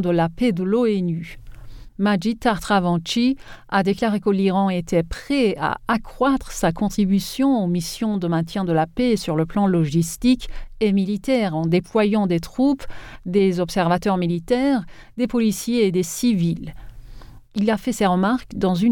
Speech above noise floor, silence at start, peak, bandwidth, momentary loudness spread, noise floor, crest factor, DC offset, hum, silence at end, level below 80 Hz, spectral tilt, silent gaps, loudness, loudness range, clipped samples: 20 dB; 0 s; -6 dBFS; 18.5 kHz; 5 LU; -40 dBFS; 14 dB; under 0.1%; none; 0 s; -42 dBFS; -6 dB/octave; none; -21 LUFS; 1 LU; under 0.1%